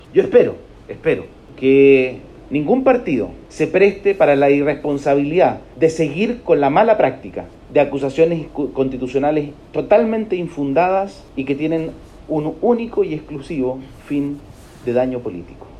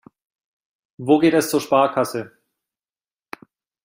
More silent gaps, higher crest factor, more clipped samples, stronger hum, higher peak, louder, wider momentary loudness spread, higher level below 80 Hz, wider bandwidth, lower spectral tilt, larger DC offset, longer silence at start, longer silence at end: neither; about the same, 16 dB vs 18 dB; neither; neither; about the same, -2 dBFS vs -4 dBFS; about the same, -17 LUFS vs -18 LUFS; second, 14 LU vs 24 LU; first, -46 dBFS vs -66 dBFS; second, 10 kHz vs 16 kHz; first, -7.5 dB/octave vs -5 dB/octave; neither; second, 0.1 s vs 1 s; second, 0 s vs 1.6 s